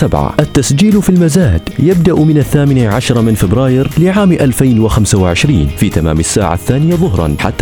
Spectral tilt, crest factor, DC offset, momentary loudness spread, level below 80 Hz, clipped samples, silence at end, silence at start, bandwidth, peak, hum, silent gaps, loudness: -6 dB/octave; 10 dB; under 0.1%; 4 LU; -24 dBFS; 0.2%; 0 s; 0 s; 20 kHz; 0 dBFS; none; none; -10 LUFS